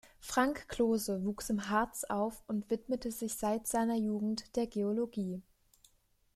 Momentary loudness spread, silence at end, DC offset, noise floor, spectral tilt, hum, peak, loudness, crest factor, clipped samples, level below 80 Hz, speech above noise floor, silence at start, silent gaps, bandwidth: 6 LU; 0.95 s; under 0.1%; -71 dBFS; -4.5 dB/octave; none; -16 dBFS; -35 LUFS; 20 dB; under 0.1%; -60 dBFS; 37 dB; 0.05 s; none; 15 kHz